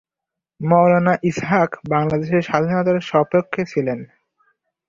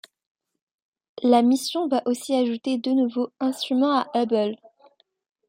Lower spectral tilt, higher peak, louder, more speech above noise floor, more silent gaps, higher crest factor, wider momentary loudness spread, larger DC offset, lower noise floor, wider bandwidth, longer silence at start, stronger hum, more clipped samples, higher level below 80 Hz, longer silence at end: first, -7.5 dB/octave vs -4.5 dB/octave; first, -2 dBFS vs -6 dBFS; first, -18 LUFS vs -23 LUFS; first, 67 dB vs 37 dB; neither; about the same, 16 dB vs 18 dB; about the same, 8 LU vs 8 LU; neither; first, -85 dBFS vs -59 dBFS; second, 7.4 kHz vs 16 kHz; second, 0.6 s vs 1.2 s; neither; neither; first, -56 dBFS vs -78 dBFS; about the same, 0.85 s vs 0.95 s